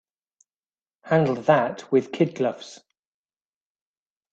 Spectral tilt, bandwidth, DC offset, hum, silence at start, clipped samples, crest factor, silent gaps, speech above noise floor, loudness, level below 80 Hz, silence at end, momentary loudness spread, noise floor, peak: -7 dB/octave; 8.2 kHz; under 0.1%; none; 1.05 s; under 0.1%; 22 dB; none; over 68 dB; -23 LUFS; -70 dBFS; 1.6 s; 9 LU; under -90 dBFS; -4 dBFS